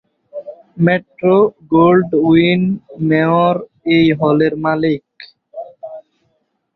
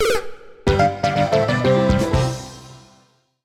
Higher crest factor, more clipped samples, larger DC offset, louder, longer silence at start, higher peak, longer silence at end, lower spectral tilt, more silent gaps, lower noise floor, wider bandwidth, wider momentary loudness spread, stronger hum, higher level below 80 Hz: about the same, 14 dB vs 16 dB; neither; neither; first, -14 LUFS vs -19 LUFS; first, 0.35 s vs 0 s; about the same, -2 dBFS vs -4 dBFS; about the same, 0.75 s vs 0.65 s; first, -10 dB/octave vs -6 dB/octave; neither; first, -65 dBFS vs -57 dBFS; second, 4.9 kHz vs 16 kHz; first, 21 LU vs 17 LU; neither; second, -52 dBFS vs -34 dBFS